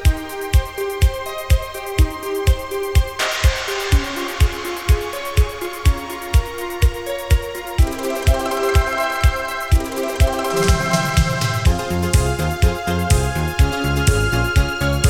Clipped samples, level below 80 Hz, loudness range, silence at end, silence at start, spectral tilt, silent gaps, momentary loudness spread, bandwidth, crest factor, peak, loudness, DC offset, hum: under 0.1%; -20 dBFS; 2 LU; 0 s; 0 s; -5 dB/octave; none; 4 LU; 17 kHz; 16 dB; -2 dBFS; -19 LUFS; under 0.1%; none